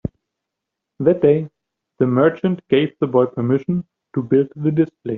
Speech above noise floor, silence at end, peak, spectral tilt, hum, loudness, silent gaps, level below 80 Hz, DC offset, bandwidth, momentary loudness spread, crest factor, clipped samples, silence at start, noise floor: 64 dB; 0 s; -2 dBFS; -7.5 dB/octave; none; -19 LUFS; none; -54 dBFS; under 0.1%; 4 kHz; 10 LU; 16 dB; under 0.1%; 1 s; -82 dBFS